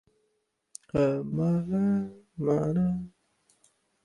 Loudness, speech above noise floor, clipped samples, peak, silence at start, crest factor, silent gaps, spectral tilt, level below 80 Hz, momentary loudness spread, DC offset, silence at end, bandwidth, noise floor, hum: -28 LUFS; 50 dB; under 0.1%; -14 dBFS; 0.95 s; 16 dB; none; -9 dB/octave; -56 dBFS; 16 LU; under 0.1%; 0.95 s; 11.5 kHz; -76 dBFS; none